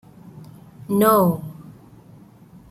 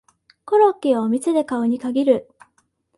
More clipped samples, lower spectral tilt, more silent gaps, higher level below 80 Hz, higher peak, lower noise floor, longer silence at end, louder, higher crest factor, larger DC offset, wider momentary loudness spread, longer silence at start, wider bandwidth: neither; about the same, -6.5 dB/octave vs -6 dB/octave; neither; first, -58 dBFS vs -66 dBFS; about the same, -4 dBFS vs -4 dBFS; second, -47 dBFS vs -65 dBFS; first, 1 s vs 0.75 s; about the same, -18 LUFS vs -19 LUFS; about the same, 20 dB vs 16 dB; neither; first, 27 LU vs 5 LU; about the same, 0.35 s vs 0.45 s; first, 16.5 kHz vs 11.5 kHz